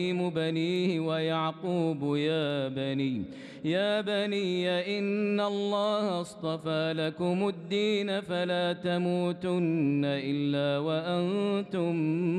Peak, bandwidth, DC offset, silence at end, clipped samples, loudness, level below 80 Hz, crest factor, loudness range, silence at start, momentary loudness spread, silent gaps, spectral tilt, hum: -16 dBFS; 10.5 kHz; under 0.1%; 0 s; under 0.1%; -29 LUFS; -72 dBFS; 12 dB; 1 LU; 0 s; 3 LU; none; -7 dB/octave; none